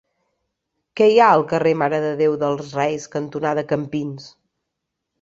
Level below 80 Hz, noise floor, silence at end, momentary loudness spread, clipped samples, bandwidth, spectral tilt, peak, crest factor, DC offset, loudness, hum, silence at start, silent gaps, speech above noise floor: -62 dBFS; -79 dBFS; 0.95 s; 14 LU; under 0.1%; 7.6 kHz; -6 dB/octave; -2 dBFS; 20 dB; under 0.1%; -19 LUFS; none; 0.95 s; none; 61 dB